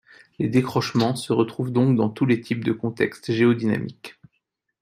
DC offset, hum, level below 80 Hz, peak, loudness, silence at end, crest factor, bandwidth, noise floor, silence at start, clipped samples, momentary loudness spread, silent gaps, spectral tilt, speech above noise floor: under 0.1%; none; -62 dBFS; -4 dBFS; -22 LUFS; 0.7 s; 18 dB; 15 kHz; -75 dBFS; 0.4 s; under 0.1%; 8 LU; none; -7 dB/octave; 53 dB